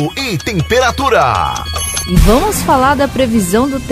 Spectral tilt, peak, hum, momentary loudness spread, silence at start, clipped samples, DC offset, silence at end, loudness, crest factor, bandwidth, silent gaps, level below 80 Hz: -4.5 dB/octave; 0 dBFS; none; 6 LU; 0 s; under 0.1%; under 0.1%; 0 s; -12 LUFS; 12 dB; 16 kHz; none; -20 dBFS